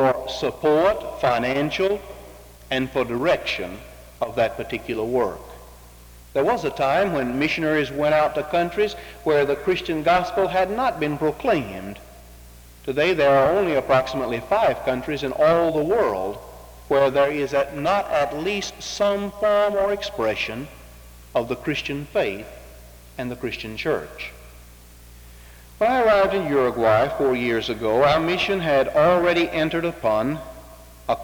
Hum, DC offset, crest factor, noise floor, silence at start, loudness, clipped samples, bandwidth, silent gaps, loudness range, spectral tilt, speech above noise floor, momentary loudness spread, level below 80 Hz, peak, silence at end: none; under 0.1%; 16 dB; -45 dBFS; 0 s; -22 LUFS; under 0.1%; over 20 kHz; none; 7 LU; -5.5 dB/octave; 24 dB; 12 LU; -46 dBFS; -6 dBFS; 0 s